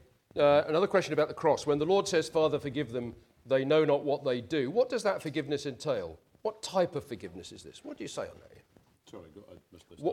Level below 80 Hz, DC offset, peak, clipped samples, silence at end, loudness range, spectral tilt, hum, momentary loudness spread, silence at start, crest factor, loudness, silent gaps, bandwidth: -66 dBFS; under 0.1%; -12 dBFS; under 0.1%; 0 s; 10 LU; -5 dB/octave; none; 18 LU; 0.35 s; 18 dB; -30 LUFS; none; 14 kHz